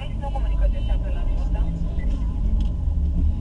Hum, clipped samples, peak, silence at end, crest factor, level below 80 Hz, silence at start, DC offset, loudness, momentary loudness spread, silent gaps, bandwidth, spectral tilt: none; under 0.1%; -10 dBFS; 0 s; 12 dB; -22 dBFS; 0 s; under 0.1%; -26 LUFS; 3 LU; none; 4 kHz; -8.5 dB/octave